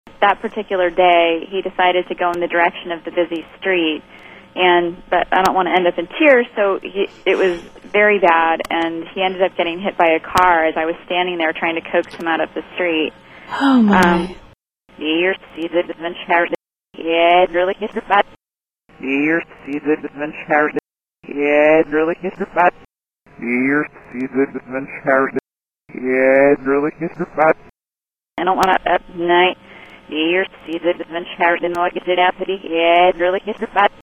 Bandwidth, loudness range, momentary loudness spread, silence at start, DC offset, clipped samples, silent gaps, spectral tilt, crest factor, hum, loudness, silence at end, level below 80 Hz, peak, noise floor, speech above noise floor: 16 kHz; 4 LU; 12 LU; 0.2 s; under 0.1%; under 0.1%; none; -5.5 dB/octave; 16 dB; none; -17 LUFS; 0.15 s; -50 dBFS; 0 dBFS; under -90 dBFS; over 73 dB